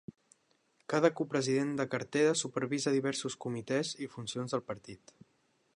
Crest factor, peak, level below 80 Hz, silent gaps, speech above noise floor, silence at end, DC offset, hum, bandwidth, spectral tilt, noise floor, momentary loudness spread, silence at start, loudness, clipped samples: 24 dB; -10 dBFS; -76 dBFS; none; 41 dB; 0.8 s; under 0.1%; none; 11 kHz; -4.5 dB/octave; -74 dBFS; 15 LU; 0.9 s; -33 LUFS; under 0.1%